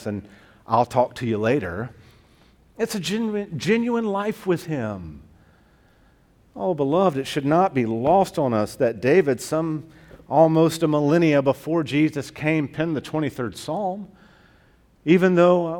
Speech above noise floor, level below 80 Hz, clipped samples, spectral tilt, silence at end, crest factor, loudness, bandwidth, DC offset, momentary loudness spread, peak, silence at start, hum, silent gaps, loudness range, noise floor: 36 dB; -56 dBFS; under 0.1%; -6.5 dB/octave; 0 s; 18 dB; -22 LUFS; 18 kHz; under 0.1%; 12 LU; -4 dBFS; 0 s; none; none; 6 LU; -57 dBFS